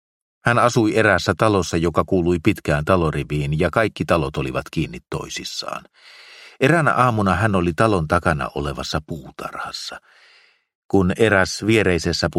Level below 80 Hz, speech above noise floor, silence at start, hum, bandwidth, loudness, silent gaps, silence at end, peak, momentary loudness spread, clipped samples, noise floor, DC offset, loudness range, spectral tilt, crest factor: -40 dBFS; 35 dB; 0.45 s; none; 15.5 kHz; -19 LUFS; 10.75-10.89 s; 0 s; 0 dBFS; 12 LU; under 0.1%; -55 dBFS; under 0.1%; 5 LU; -5.5 dB/octave; 20 dB